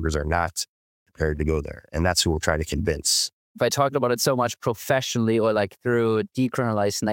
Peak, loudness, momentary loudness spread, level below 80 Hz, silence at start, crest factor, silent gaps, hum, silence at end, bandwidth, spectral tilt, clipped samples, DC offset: -4 dBFS; -23 LUFS; 7 LU; -38 dBFS; 0 s; 18 dB; 0.68-1.06 s, 3.33-3.55 s; none; 0 s; 17 kHz; -4 dB/octave; under 0.1%; under 0.1%